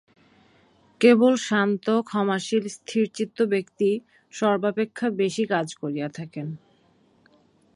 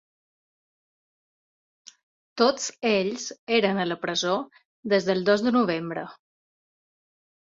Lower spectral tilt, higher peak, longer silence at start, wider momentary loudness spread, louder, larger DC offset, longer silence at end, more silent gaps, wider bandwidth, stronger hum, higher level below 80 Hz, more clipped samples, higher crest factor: first, -5.5 dB/octave vs -4 dB/octave; about the same, -4 dBFS vs -6 dBFS; second, 1 s vs 2.35 s; about the same, 14 LU vs 13 LU; about the same, -24 LUFS vs -25 LUFS; neither; about the same, 1.2 s vs 1.3 s; second, none vs 3.39-3.47 s, 4.65-4.83 s; first, 11.5 kHz vs 7.8 kHz; neither; about the same, -74 dBFS vs -70 dBFS; neither; about the same, 20 dB vs 20 dB